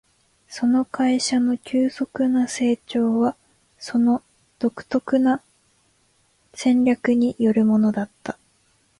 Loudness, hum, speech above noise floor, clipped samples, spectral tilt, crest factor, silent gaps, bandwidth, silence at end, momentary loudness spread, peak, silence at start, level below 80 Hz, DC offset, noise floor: -21 LUFS; none; 43 dB; under 0.1%; -5 dB/octave; 14 dB; none; 11.5 kHz; 0.65 s; 10 LU; -8 dBFS; 0.5 s; -62 dBFS; under 0.1%; -63 dBFS